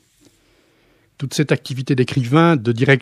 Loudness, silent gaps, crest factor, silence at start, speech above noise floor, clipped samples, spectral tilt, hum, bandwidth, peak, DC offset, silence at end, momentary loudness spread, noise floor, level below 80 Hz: -17 LUFS; none; 18 dB; 1.2 s; 41 dB; under 0.1%; -6.5 dB/octave; none; 14.5 kHz; 0 dBFS; under 0.1%; 0 s; 9 LU; -57 dBFS; -62 dBFS